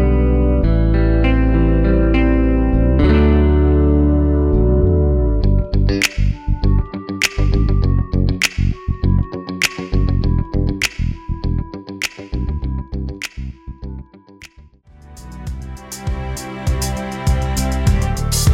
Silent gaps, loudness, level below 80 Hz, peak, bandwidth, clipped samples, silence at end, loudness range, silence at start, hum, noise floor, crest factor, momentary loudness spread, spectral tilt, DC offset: none; -17 LUFS; -18 dBFS; -2 dBFS; 16 kHz; under 0.1%; 0 s; 14 LU; 0 s; none; -45 dBFS; 14 dB; 13 LU; -6 dB/octave; under 0.1%